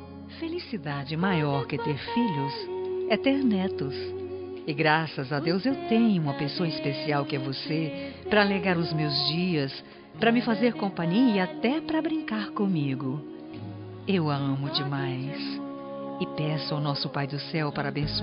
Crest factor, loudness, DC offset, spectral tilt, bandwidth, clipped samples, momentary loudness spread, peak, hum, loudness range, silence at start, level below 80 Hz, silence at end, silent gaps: 20 dB; -28 LUFS; under 0.1%; -4.5 dB/octave; 5.4 kHz; under 0.1%; 12 LU; -6 dBFS; none; 4 LU; 0 s; -58 dBFS; 0 s; none